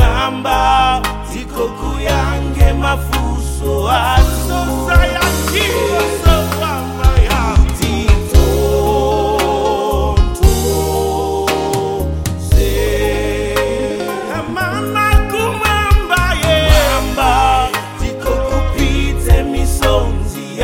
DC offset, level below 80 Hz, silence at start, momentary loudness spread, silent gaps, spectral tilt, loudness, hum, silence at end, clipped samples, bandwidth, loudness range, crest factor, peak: 0.6%; -16 dBFS; 0 s; 7 LU; none; -5 dB/octave; -15 LUFS; none; 0 s; 0.3%; 17 kHz; 3 LU; 14 dB; 0 dBFS